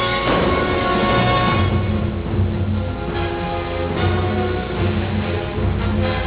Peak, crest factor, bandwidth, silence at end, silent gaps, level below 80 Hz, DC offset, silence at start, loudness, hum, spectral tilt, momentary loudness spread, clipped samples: -4 dBFS; 14 dB; 4 kHz; 0 s; none; -28 dBFS; under 0.1%; 0 s; -20 LUFS; none; -10.5 dB/octave; 7 LU; under 0.1%